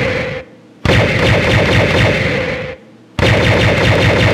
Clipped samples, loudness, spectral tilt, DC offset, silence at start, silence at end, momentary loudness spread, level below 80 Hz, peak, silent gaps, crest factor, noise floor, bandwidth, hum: under 0.1%; -12 LUFS; -5.5 dB/octave; under 0.1%; 0 s; 0 s; 12 LU; -26 dBFS; 0 dBFS; none; 12 dB; -32 dBFS; 13.5 kHz; none